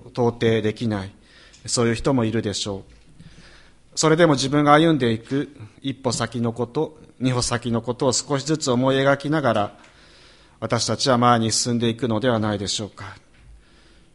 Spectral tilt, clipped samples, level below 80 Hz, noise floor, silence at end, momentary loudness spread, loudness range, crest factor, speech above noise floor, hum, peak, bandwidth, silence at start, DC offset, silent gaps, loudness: -4.5 dB/octave; under 0.1%; -50 dBFS; -52 dBFS; 1 s; 13 LU; 4 LU; 22 dB; 31 dB; none; 0 dBFS; 11.5 kHz; 0.05 s; under 0.1%; none; -21 LUFS